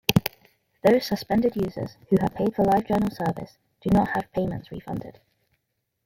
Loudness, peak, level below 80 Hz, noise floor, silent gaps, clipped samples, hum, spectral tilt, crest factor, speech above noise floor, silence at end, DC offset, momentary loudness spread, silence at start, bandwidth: -25 LUFS; 0 dBFS; -50 dBFS; -77 dBFS; none; under 0.1%; none; -6.5 dB/octave; 26 dB; 53 dB; 0.95 s; under 0.1%; 14 LU; 0.1 s; 16.5 kHz